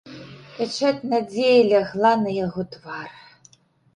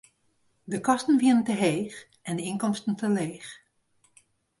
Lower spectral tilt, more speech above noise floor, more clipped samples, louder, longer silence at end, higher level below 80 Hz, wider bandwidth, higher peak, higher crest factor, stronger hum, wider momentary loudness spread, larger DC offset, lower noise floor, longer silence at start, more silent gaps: about the same, -5.5 dB/octave vs -5.5 dB/octave; second, 35 dB vs 44 dB; neither; first, -21 LUFS vs -26 LUFS; second, 0.85 s vs 1.05 s; first, -62 dBFS vs -70 dBFS; second, 10 kHz vs 11.5 kHz; first, -4 dBFS vs -10 dBFS; about the same, 18 dB vs 18 dB; neither; first, 23 LU vs 16 LU; neither; second, -56 dBFS vs -69 dBFS; second, 0.05 s vs 0.65 s; neither